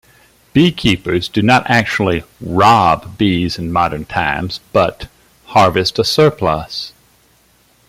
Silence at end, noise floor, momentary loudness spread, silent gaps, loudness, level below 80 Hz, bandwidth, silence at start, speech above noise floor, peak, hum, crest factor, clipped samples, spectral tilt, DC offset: 1 s; -53 dBFS; 10 LU; none; -14 LUFS; -40 dBFS; 16 kHz; 0.55 s; 39 dB; 0 dBFS; none; 16 dB; under 0.1%; -5.5 dB/octave; under 0.1%